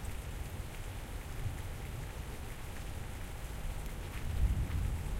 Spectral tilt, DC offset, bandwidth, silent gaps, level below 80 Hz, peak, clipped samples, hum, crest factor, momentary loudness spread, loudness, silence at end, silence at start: -5.5 dB/octave; under 0.1%; 16 kHz; none; -40 dBFS; -20 dBFS; under 0.1%; none; 18 dB; 9 LU; -42 LUFS; 0 s; 0 s